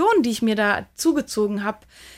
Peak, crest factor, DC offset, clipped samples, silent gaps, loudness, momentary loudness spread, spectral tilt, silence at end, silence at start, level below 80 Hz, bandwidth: -8 dBFS; 14 dB; under 0.1%; under 0.1%; none; -22 LUFS; 8 LU; -4 dB/octave; 0.05 s; 0 s; -56 dBFS; 16 kHz